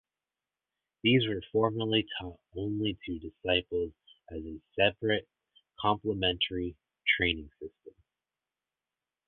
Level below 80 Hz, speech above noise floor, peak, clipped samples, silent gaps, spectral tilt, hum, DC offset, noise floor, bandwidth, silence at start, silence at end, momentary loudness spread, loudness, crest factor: -54 dBFS; over 59 dB; -10 dBFS; under 0.1%; none; -9 dB/octave; none; under 0.1%; under -90 dBFS; 4.3 kHz; 1.05 s; 1.4 s; 15 LU; -30 LUFS; 22 dB